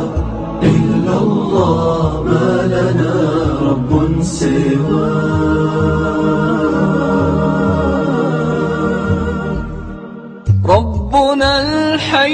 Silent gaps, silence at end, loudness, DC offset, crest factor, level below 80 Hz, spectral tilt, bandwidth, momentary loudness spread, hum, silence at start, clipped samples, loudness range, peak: none; 0 s; -14 LUFS; under 0.1%; 14 dB; -28 dBFS; -7 dB/octave; 9.6 kHz; 6 LU; none; 0 s; under 0.1%; 2 LU; 0 dBFS